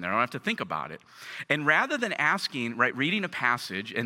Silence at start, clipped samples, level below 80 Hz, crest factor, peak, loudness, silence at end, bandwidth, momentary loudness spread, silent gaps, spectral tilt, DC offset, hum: 0 s; under 0.1%; -74 dBFS; 20 dB; -8 dBFS; -27 LUFS; 0 s; 17 kHz; 13 LU; none; -4 dB/octave; under 0.1%; none